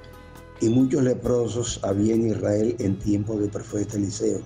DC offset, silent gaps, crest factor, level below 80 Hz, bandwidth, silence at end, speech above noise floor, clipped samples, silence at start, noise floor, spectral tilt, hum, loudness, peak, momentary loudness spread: under 0.1%; none; 12 dB; -46 dBFS; 13.5 kHz; 0 s; 21 dB; under 0.1%; 0 s; -44 dBFS; -6.5 dB/octave; none; -24 LUFS; -12 dBFS; 6 LU